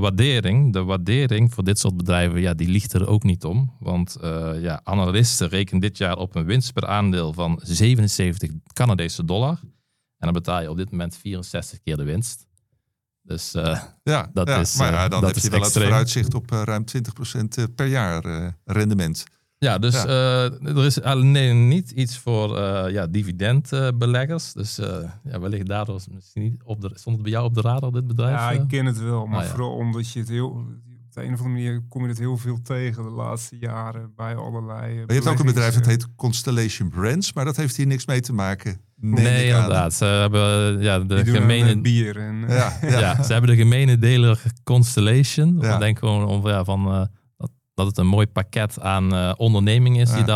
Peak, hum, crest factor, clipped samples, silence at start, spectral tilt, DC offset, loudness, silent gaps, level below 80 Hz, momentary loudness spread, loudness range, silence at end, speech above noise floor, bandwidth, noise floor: -6 dBFS; none; 14 dB; under 0.1%; 0 s; -5.5 dB/octave; under 0.1%; -21 LUFS; none; -48 dBFS; 12 LU; 9 LU; 0 s; 55 dB; 14.5 kHz; -75 dBFS